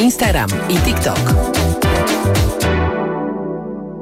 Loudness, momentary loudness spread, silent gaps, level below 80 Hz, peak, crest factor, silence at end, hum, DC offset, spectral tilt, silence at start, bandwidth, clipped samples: -16 LUFS; 8 LU; none; -24 dBFS; -4 dBFS; 12 dB; 0 s; none; under 0.1%; -5 dB/octave; 0 s; 16.5 kHz; under 0.1%